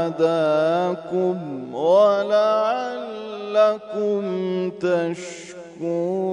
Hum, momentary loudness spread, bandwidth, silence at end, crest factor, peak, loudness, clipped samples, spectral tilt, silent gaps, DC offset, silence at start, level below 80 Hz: none; 14 LU; 10 kHz; 0 s; 16 dB; -6 dBFS; -21 LUFS; under 0.1%; -6 dB/octave; none; under 0.1%; 0 s; -70 dBFS